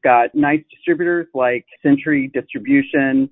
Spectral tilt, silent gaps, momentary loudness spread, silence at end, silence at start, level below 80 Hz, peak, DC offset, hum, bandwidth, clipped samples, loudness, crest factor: -12 dB/octave; none; 6 LU; 0.05 s; 0.05 s; -58 dBFS; -2 dBFS; under 0.1%; none; 3.9 kHz; under 0.1%; -17 LUFS; 14 dB